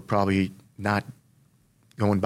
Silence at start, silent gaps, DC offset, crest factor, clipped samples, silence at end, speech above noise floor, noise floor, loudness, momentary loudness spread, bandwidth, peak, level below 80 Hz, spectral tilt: 0 s; none; under 0.1%; 18 dB; under 0.1%; 0 s; 38 dB; -62 dBFS; -27 LUFS; 8 LU; 13.5 kHz; -8 dBFS; -62 dBFS; -7.5 dB/octave